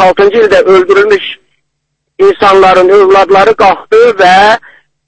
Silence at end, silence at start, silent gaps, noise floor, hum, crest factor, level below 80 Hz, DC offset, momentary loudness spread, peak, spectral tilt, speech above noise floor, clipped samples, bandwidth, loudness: 0.5 s; 0 s; none; -66 dBFS; none; 6 dB; -40 dBFS; under 0.1%; 5 LU; 0 dBFS; -4.5 dB/octave; 62 dB; 4%; 9.8 kHz; -5 LUFS